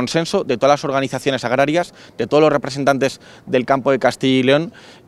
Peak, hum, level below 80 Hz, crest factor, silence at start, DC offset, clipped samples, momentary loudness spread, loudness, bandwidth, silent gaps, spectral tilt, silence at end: 0 dBFS; none; -56 dBFS; 16 dB; 0 s; under 0.1%; under 0.1%; 7 LU; -17 LUFS; 13.5 kHz; none; -5 dB/octave; 0.15 s